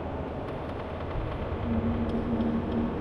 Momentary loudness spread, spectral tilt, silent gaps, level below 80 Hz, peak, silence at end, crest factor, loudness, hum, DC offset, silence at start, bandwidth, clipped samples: 7 LU; -9.5 dB/octave; none; -40 dBFS; -16 dBFS; 0 s; 14 dB; -31 LUFS; none; under 0.1%; 0 s; 6 kHz; under 0.1%